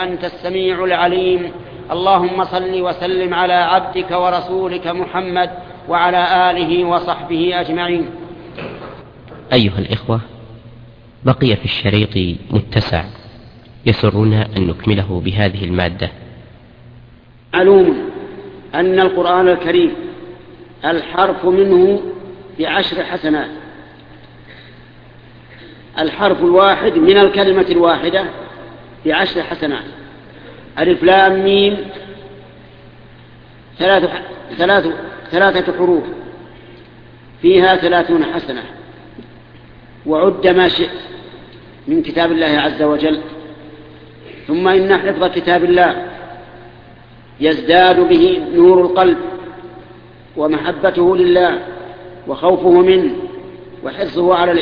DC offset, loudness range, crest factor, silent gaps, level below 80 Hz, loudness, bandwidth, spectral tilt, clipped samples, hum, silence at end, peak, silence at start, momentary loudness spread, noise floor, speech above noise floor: under 0.1%; 6 LU; 16 dB; none; -42 dBFS; -14 LUFS; 5.2 kHz; -8.5 dB/octave; under 0.1%; none; 0 s; 0 dBFS; 0 s; 20 LU; -42 dBFS; 29 dB